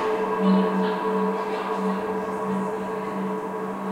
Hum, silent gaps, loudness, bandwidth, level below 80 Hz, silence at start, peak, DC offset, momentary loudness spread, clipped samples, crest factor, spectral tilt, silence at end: none; none; -25 LUFS; 12.5 kHz; -64 dBFS; 0 s; -10 dBFS; under 0.1%; 8 LU; under 0.1%; 14 dB; -7.5 dB/octave; 0 s